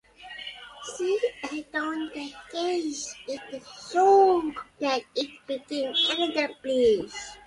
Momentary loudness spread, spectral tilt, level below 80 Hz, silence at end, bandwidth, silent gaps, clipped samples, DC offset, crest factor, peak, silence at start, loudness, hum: 17 LU; -2.5 dB/octave; -62 dBFS; 0.1 s; 11.5 kHz; none; under 0.1%; under 0.1%; 18 dB; -10 dBFS; 0.2 s; -26 LUFS; none